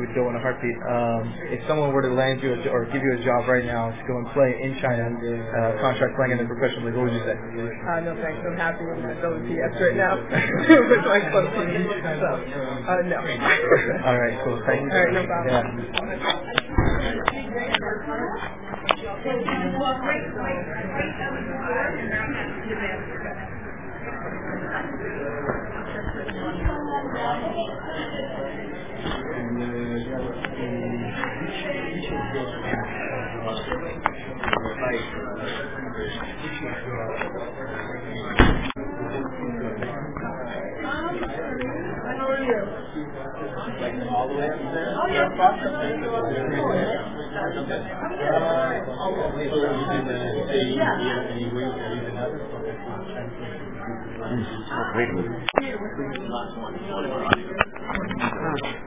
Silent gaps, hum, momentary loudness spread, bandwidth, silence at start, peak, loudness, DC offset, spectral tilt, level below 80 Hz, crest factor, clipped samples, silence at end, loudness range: none; none; 10 LU; 3.9 kHz; 0 s; 0 dBFS; -25 LUFS; 1%; -10 dB/octave; -42 dBFS; 26 dB; under 0.1%; 0 s; 8 LU